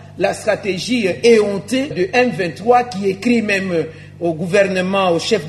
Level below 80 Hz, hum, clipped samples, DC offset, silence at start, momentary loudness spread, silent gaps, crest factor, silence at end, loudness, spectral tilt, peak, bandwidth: -54 dBFS; 50 Hz at -40 dBFS; under 0.1%; under 0.1%; 0 s; 7 LU; none; 16 dB; 0 s; -16 LUFS; -5 dB/octave; 0 dBFS; 13.5 kHz